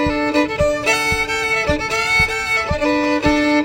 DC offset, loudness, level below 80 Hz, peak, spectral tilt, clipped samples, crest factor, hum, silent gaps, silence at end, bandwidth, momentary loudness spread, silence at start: under 0.1%; -16 LUFS; -34 dBFS; -2 dBFS; -4 dB/octave; under 0.1%; 14 dB; none; none; 0 s; 16.5 kHz; 3 LU; 0 s